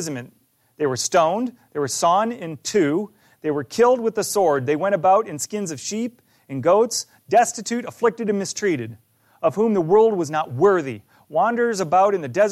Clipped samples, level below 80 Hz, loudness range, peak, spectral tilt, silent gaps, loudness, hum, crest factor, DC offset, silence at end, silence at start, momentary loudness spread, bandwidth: under 0.1%; -66 dBFS; 2 LU; -6 dBFS; -4.5 dB/octave; none; -21 LUFS; none; 14 dB; under 0.1%; 0 s; 0 s; 10 LU; 15 kHz